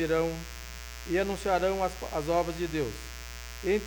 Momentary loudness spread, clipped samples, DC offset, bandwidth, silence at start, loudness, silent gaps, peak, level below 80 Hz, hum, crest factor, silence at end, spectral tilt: 14 LU; under 0.1%; under 0.1%; over 20 kHz; 0 s; -31 LUFS; none; -14 dBFS; -44 dBFS; none; 16 dB; 0 s; -5 dB/octave